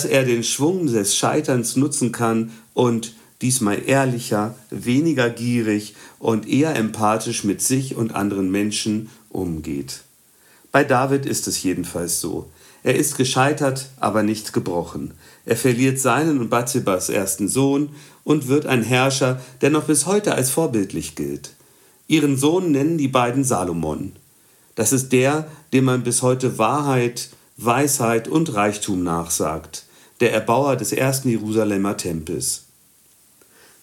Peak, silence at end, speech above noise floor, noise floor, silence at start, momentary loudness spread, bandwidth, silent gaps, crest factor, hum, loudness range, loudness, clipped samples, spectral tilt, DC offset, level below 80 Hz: -2 dBFS; 1.25 s; 35 dB; -55 dBFS; 0 s; 10 LU; 17 kHz; none; 20 dB; none; 3 LU; -20 LUFS; under 0.1%; -4.5 dB/octave; under 0.1%; -56 dBFS